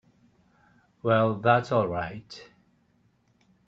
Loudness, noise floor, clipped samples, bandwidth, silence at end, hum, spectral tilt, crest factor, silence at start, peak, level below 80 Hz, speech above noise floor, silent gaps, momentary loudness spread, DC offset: -25 LUFS; -67 dBFS; under 0.1%; 7.6 kHz; 1.25 s; none; -7.5 dB/octave; 22 dB; 1.05 s; -6 dBFS; -64 dBFS; 42 dB; none; 21 LU; under 0.1%